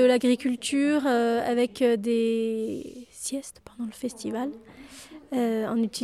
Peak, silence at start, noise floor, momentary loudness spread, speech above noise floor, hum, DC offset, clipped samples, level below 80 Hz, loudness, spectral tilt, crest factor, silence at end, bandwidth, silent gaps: -10 dBFS; 0 s; -46 dBFS; 19 LU; 21 dB; none; under 0.1%; under 0.1%; -64 dBFS; -26 LUFS; -4 dB/octave; 16 dB; 0 s; 14 kHz; none